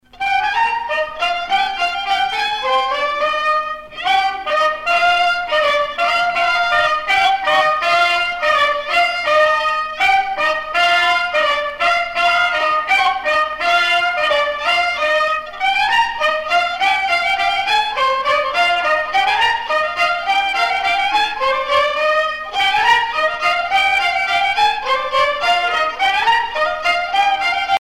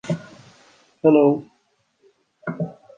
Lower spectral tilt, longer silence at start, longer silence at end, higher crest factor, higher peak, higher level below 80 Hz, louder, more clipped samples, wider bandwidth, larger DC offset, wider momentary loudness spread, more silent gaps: second, -0.5 dB/octave vs -8.5 dB/octave; about the same, 0.15 s vs 0.05 s; second, 0 s vs 0.25 s; about the same, 16 dB vs 20 dB; about the same, -2 dBFS vs -4 dBFS; first, -50 dBFS vs -68 dBFS; first, -15 LUFS vs -20 LUFS; neither; first, 16.5 kHz vs 8.6 kHz; neither; second, 4 LU vs 17 LU; neither